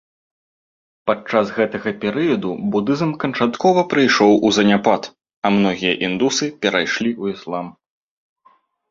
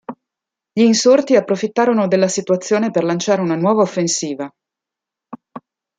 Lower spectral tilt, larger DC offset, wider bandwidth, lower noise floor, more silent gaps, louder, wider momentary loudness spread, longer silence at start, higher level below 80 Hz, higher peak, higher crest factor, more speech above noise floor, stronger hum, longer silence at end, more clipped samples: about the same, -4.5 dB/octave vs -4.5 dB/octave; neither; second, 7.6 kHz vs 9.4 kHz; second, -57 dBFS vs -85 dBFS; first, 5.36-5.42 s vs none; about the same, -18 LUFS vs -16 LUFS; second, 11 LU vs 15 LU; first, 1.05 s vs 0.1 s; first, -58 dBFS vs -66 dBFS; about the same, -2 dBFS vs -2 dBFS; about the same, 18 dB vs 16 dB; second, 39 dB vs 70 dB; neither; first, 1.2 s vs 0.4 s; neither